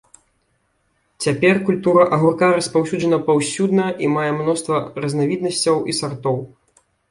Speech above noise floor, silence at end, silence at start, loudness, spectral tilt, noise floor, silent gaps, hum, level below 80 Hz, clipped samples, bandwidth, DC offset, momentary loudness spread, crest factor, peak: 48 dB; 0.65 s; 1.2 s; -18 LUFS; -5 dB/octave; -66 dBFS; none; none; -58 dBFS; under 0.1%; 11.5 kHz; under 0.1%; 8 LU; 18 dB; -2 dBFS